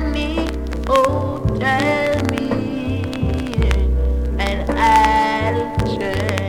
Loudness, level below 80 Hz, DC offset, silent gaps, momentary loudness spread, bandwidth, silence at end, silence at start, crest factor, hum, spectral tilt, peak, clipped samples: -18 LUFS; -24 dBFS; under 0.1%; none; 7 LU; 14.5 kHz; 0 s; 0 s; 18 dB; none; -6 dB/octave; 0 dBFS; under 0.1%